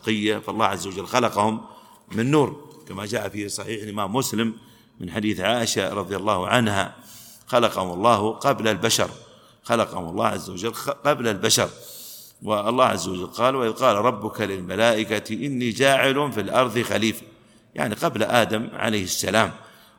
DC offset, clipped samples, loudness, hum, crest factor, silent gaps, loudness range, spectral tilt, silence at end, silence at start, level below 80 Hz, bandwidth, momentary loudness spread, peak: under 0.1%; under 0.1%; -23 LUFS; none; 22 dB; none; 4 LU; -4 dB/octave; 0.3 s; 0.05 s; -60 dBFS; 19 kHz; 12 LU; 0 dBFS